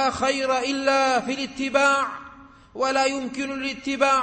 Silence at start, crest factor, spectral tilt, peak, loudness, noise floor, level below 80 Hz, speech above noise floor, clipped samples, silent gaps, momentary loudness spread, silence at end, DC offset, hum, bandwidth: 0 s; 18 dB; -2.5 dB/octave; -6 dBFS; -23 LUFS; -46 dBFS; -56 dBFS; 23 dB; under 0.1%; none; 9 LU; 0 s; under 0.1%; none; 8.8 kHz